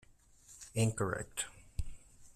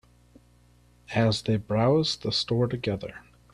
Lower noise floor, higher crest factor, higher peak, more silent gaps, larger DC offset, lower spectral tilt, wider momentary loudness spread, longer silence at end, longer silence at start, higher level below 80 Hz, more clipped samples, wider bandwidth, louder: about the same, -61 dBFS vs -59 dBFS; about the same, 20 dB vs 18 dB; second, -20 dBFS vs -10 dBFS; neither; neither; second, -4.5 dB/octave vs -6 dB/octave; first, 19 LU vs 8 LU; second, 0.05 s vs 0.35 s; second, 0.5 s vs 1.1 s; about the same, -50 dBFS vs -54 dBFS; neither; first, 14 kHz vs 11 kHz; second, -38 LUFS vs -26 LUFS